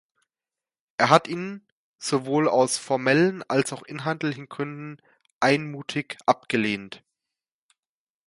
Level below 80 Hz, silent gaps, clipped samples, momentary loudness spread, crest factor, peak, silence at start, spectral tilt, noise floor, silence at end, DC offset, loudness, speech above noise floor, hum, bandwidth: -70 dBFS; 1.72-1.94 s, 5.33-5.41 s; under 0.1%; 16 LU; 24 dB; -2 dBFS; 1 s; -4.5 dB/octave; under -90 dBFS; 1.3 s; under 0.1%; -24 LUFS; over 66 dB; none; 11.5 kHz